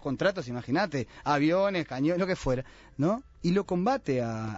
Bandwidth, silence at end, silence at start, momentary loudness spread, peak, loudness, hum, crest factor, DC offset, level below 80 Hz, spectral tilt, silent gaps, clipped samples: 8 kHz; 0 s; 0 s; 6 LU; -14 dBFS; -29 LUFS; none; 16 dB; under 0.1%; -52 dBFS; -6.5 dB/octave; none; under 0.1%